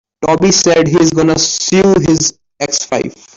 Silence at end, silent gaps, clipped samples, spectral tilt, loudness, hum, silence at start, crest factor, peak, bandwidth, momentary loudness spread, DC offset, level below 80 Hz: 0.25 s; none; under 0.1%; -4 dB/octave; -11 LUFS; none; 0.2 s; 10 dB; -2 dBFS; 7.8 kHz; 8 LU; under 0.1%; -42 dBFS